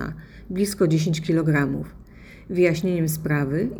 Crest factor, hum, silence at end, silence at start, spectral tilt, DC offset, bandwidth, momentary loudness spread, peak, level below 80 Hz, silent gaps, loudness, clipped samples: 16 dB; none; 0 s; 0 s; -6.5 dB/octave; under 0.1%; over 20 kHz; 12 LU; -6 dBFS; -46 dBFS; none; -23 LUFS; under 0.1%